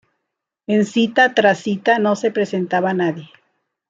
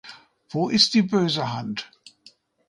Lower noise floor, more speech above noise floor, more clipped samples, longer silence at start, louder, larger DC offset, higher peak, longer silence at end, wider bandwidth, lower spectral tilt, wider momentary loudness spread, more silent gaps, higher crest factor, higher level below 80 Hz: first, -79 dBFS vs -56 dBFS; first, 62 dB vs 33 dB; neither; first, 0.7 s vs 0.05 s; first, -17 LUFS vs -22 LUFS; neither; about the same, -2 dBFS vs -4 dBFS; second, 0.65 s vs 0.85 s; second, 8 kHz vs 11.5 kHz; about the same, -5.5 dB/octave vs -4.5 dB/octave; second, 8 LU vs 15 LU; neither; about the same, 18 dB vs 20 dB; about the same, -66 dBFS vs -66 dBFS